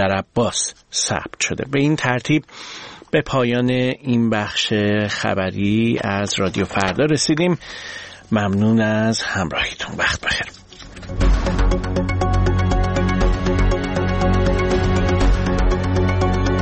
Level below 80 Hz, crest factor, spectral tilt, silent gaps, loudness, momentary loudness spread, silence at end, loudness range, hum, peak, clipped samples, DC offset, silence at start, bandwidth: -26 dBFS; 18 dB; -5 dB/octave; none; -19 LUFS; 5 LU; 0 s; 2 LU; none; -2 dBFS; under 0.1%; under 0.1%; 0 s; 8.8 kHz